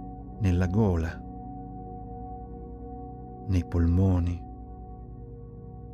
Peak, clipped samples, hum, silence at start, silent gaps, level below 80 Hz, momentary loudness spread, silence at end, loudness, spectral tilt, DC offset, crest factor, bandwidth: -14 dBFS; under 0.1%; none; 0 s; none; -42 dBFS; 19 LU; 0 s; -28 LUFS; -9 dB/octave; under 0.1%; 16 dB; 7 kHz